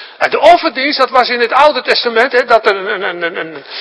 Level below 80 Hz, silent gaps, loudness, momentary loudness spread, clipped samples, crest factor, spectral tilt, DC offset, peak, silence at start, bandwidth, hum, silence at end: -50 dBFS; none; -11 LUFS; 10 LU; 1%; 12 dB; -3 dB/octave; under 0.1%; 0 dBFS; 0 s; 11 kHz; none; 0 s